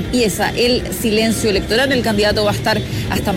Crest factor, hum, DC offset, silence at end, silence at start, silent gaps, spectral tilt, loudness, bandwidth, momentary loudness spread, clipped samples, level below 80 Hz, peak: 12 dB; none; under 0.1%; 0 s; 0 s; none; -4.5 dB/octave; -16 LUFS; 16.5 kHz; 3 LU; under 0.1%; -32 dBFS; -4 dBFS